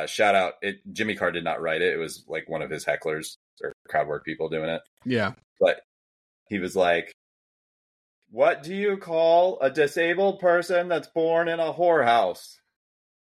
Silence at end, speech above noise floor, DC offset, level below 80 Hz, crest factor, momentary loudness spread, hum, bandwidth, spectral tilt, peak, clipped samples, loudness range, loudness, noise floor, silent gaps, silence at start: 0.7 s; over 66 dB; under 0.1%; -68 dBFS; 18 dB; 12 LU; none; 14 kHz; -4.5 dB/octave; -8 dBFS; under 0.1%; 6 LU; -25 LUFS; under -90 dBFS; 3.36-3.57 s, 3.74-3.85 s, 4.88-4.97 s, 5.44-5.56 s, 5.84-6.46 s, 7.14-8.22 s; 0 s